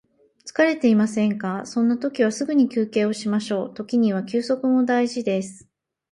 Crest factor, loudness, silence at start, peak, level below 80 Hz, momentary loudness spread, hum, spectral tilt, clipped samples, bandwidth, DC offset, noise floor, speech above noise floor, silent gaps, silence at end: 16 dB; -22 LUFS; 0.45 s; -6 dBFS; -68 dBFS; 8 LU; none; -6 dB/octave; under 0.1%; 11.5 kHz; under 0.1%; -46 dBFS; 25 dB; none; 0.55 s